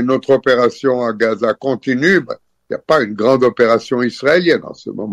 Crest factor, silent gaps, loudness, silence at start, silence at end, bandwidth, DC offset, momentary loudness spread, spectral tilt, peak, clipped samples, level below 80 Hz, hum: 14 dB; none; -14 LUFS; 0 s; 0 s; 11.5 kHz; under 0.1%; 14 LU; -6 dB/octave; -2 dBFS; under 0.1%; -58 dBFS; none